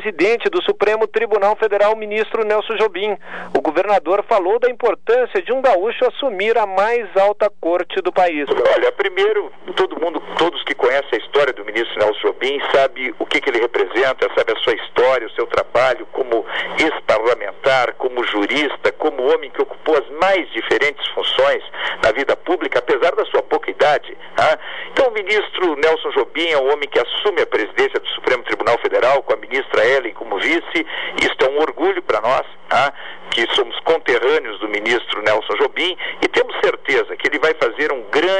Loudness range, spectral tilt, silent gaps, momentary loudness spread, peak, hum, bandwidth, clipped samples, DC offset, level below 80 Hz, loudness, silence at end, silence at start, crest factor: 1 LU; -3.5 dB/octave; none; 5 LU; -4 dBFS; none; 10 kHz; under 0.1%; 2%; -58 dBFS; -17 LUFS; 0 s; 0 s; 14 dB